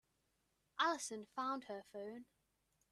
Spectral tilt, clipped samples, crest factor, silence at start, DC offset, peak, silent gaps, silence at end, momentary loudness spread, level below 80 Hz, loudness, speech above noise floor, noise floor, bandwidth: -2 dB/octave; under 0.1%; 24 dB; 0.75 s; under 0.1%; -22 dBFS; none; 0.65 s; 14 LU; -88 dBFS; -43 LUFS; 38 dB; -83 dBFS; 13.5 kHz